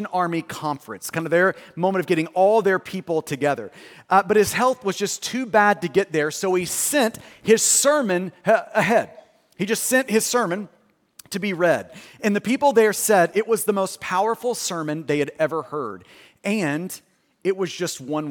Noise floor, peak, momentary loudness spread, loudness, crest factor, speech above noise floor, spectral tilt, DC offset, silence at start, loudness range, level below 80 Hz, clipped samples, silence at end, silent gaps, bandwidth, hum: -51 dBFS; -4 dBFS; 12 LU; -21 LUFS; 18 dB; 30 dB; -3.5 dB/octave; under 0.1%; 0 s; 5 LU; -64 dBFS; under 0.1%; 0 s; none; 18 kHz; none